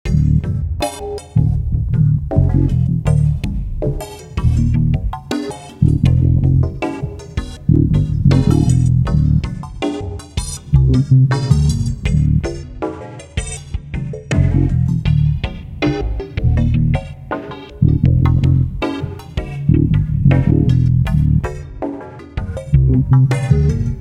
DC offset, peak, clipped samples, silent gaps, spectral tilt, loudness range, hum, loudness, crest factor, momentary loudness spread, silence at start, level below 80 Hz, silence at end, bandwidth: under 0.1%; 0 dBFS; under 0.1%; none; -7.5 dB/octave; 3 LU; none; -16 LUFS; 16 dB; 13 LU; 0.05 s; -22 dBFS; 0 s; 11.5 kHz